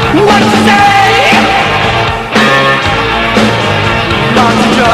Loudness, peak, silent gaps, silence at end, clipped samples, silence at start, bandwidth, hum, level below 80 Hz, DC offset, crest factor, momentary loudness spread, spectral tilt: -7 LUFS; 0 dBFS; none; 0 s; 0.4%; 0 s; 15 kHz; none; -28 dBFS; under 0.1%; 8 dB; 5 LU; -4.5 dB/octave